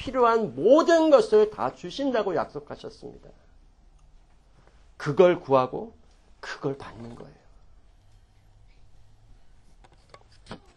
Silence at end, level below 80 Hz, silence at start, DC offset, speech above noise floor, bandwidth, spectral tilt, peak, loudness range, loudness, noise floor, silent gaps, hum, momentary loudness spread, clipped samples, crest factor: 0.2 s; -56 dBFS; 0 s; under 0.1%; 33 dB; 10 kHz; -6 dB/octave; -4 dBFS; 18 LU; -23 LUFS; -56 dBFS; none; none; 25 LU; under 0.1%; 22 dB